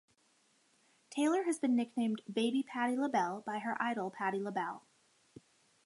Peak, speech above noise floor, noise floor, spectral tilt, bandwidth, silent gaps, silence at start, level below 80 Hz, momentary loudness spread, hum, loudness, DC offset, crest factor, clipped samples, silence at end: -18 dBFS; 38 dB; -72 dBFS; -4.5 dB/octave; 11.5 kHz; none; 1.1 s; -88 dBFS; 7 LU; none; -35 LUFS; under 0.1%; 18 dB; under 0.1%; 1.05 s